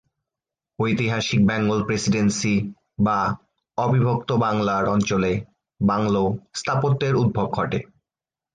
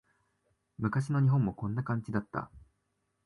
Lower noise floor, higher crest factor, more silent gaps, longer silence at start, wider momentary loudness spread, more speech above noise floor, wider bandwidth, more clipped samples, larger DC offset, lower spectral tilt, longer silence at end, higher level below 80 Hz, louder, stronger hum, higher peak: first, under -90 dBFS vs -79 dBFS; about the same, 14 dB vs 16 dB; neither; about the same, 0.8 s vs 0.8 s; second, 7 LU vs 12 LU; first, over 69 dB vs 49 dB; second, 9.6 kHz vs 11 kHz; neither; neither; second, -6 dB/octave vs -9 dB/octave; about the same, 0.7 s vs 0.65 s; first, -50 dBFS vs -60 dBFS; first, -22 LUFS vs -32 LUFS; neither; first, -8 dBFS vs -16 dBFS